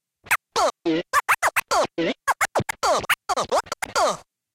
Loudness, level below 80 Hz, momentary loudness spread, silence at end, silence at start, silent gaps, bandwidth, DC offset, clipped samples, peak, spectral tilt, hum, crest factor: -23 LUFS; -56 dBFS; 4 LU; 0.35 s; 0.25 s; none; 17 kHz; under 0.1%; under 0.1%; -6 dBFS; -2.5 dB/octave; none; 18 dB